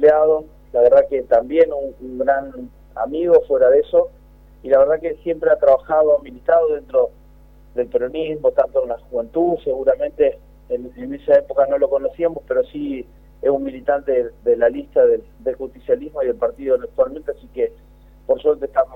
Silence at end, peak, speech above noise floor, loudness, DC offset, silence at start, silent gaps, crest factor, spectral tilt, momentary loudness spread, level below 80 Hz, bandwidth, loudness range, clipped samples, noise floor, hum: 0 s; -2 dBFS; 28 dB; -18 LUFS; under 0.1%; 0 s; none; 16 dB; -8 dB/octave; 13 LU; -46 dBFS; 4 kHz; 4 LU; under 0.1%; -46 dBFS; none